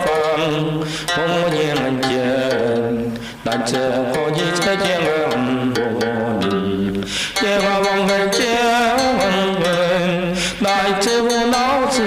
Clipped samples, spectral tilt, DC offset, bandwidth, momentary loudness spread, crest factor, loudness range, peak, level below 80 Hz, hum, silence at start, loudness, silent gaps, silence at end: under 0.1%; -4 dB/octave; under 0.1%; 16 kHz; 5 LU; 14 dB; 3 LU; -4 dBFS; -46 dBFS; none; 0 s; -18 LUFS; none; 0 s